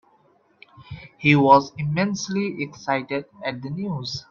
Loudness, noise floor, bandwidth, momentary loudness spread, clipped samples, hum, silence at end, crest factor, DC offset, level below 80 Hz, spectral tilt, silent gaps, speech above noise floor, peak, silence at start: -22 LUFS; -60 dBFS; 7.4 kHz; 15 LU; under 0.1%; none; 0.1 s; 22 dB; under 0.1%; -60 dBFS; -6 dB/octave; none; 38 dB; -2 dBFS; 0.8 s